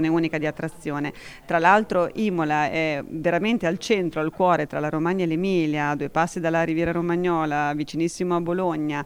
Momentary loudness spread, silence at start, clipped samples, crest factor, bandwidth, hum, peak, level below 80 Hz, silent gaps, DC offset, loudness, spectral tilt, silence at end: 6 LU; 0 s; under 0.1%; 20 dB; 15 kHz; none; -4 dBFS; -52 dBFS; none; under 0.1%; -23 LUFS; -6 dB/octave; 0 s